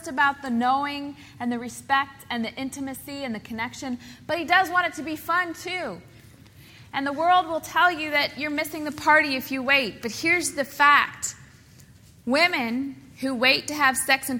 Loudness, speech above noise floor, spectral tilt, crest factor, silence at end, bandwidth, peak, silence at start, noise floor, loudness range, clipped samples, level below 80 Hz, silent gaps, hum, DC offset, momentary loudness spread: -23 LUFS; 26 dB; -2.5 dB/octave; 20 dB; 0 s; 18 kHz; -4 dBFS; 0 s; -51 dBFS; 6 LU; under 0.1%; -60 dBFS; none; none; under 0.1%; 13 LU